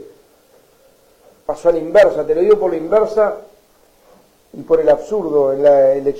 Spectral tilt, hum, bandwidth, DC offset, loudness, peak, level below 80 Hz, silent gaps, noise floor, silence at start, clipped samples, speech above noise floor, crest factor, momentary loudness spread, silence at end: -6.5 dB/octave; none; 10.5 kHz; under 0.1%; -14 LUFS; -4 dBFS; -48 dBFS; none; -52 dBFS; 0 s; under 0.1%; 38 dB; 12 dB; 10 LU; 0 s